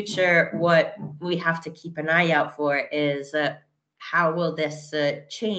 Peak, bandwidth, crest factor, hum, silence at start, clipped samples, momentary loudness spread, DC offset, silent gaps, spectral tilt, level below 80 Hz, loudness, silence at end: -6 dBFS; 8.8 kHz; 18 dB; none; 0 s; under 0.1%; 10 LU; under 0.1%; none; -5.5 dB/octave; -72 dBFS; -23 LUFS; 0 s